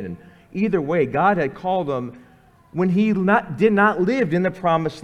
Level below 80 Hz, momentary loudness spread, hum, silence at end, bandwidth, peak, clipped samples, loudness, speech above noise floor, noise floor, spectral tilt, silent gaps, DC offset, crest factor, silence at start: -54 dBFS; 14 LU; none; 0 s; 8.6 kHz; -4 dBFS; under 0.1%; -20 LUFS; 32 dB; -51 dBFS; -8 dB/octave; none; under 0.1%; 16 dB; 0 s